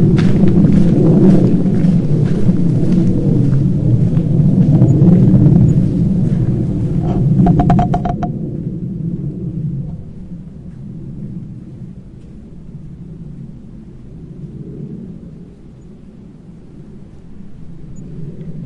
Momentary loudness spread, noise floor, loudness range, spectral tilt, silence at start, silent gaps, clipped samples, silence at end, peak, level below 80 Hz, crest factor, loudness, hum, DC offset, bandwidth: 24 LU; -36 dBFS; 22 LU; -10.5 dB/octave; 0 s; none; under 0.1%; 0 s; 0 dBFS; -30 dBFS; 14 dB; -13 LUFS; none; under 0.1%; 7.2 kHz